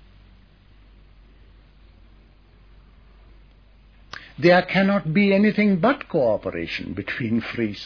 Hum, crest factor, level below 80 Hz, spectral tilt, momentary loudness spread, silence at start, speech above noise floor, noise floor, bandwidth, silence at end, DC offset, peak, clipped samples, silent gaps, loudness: none; 20 dB; -50 dBFS; -8 dB/octave; 12 LU; 4.15 s; 31 dB; -52 dBFS; 5.4 kHz; 0 s; under 0.1%; -4 dBFS; under 0.1%; none; -21 LUFS